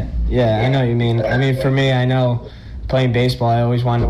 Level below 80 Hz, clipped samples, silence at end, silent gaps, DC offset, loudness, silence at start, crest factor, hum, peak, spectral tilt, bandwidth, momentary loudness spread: -28 dBFS; under 0.1%; 0 s; none; under 0.1%; -17 LUFS; 0 s; 10 dB; none; -8 dBFS; -7.5 dB/octave; 12 kHz; 5 LU